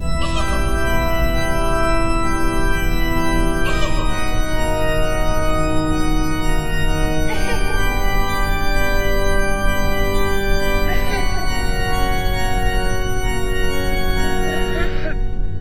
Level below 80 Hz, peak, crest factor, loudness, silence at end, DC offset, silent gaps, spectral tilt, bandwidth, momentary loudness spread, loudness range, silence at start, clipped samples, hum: -20 dBFS; -4 dBFS; 12 dB; -21 LUFS; 0 s; under 0.1%; none; -5 dB/octave; 16 kHz; 3 LU; 1 LU; 0 s; under 0.1%; none